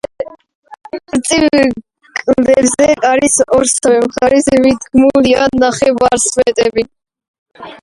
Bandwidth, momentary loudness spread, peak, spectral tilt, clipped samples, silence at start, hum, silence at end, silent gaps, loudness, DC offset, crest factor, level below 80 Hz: 11.5 kHz; 14 LU; 0 dBFS; -3 dB/octave; under 0.1%; 0.2 s; none; 0.05 s; 0.55-0.63 s, 7.28-7.46 s; -11 LUFS; under 0.1%; 12 dB; -42 dBFS